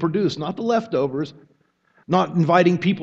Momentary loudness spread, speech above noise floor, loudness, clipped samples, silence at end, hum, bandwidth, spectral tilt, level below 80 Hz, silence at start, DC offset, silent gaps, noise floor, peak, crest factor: 9 LU; 41 dB; -20 LUFS; under 0.1%; 0 s; none; 7.6 kHz; -7.5 dB/octave; -64 dBFS; 0 s; under 0.1%; none; -61 dBFS; -2 dBFS; 20 dB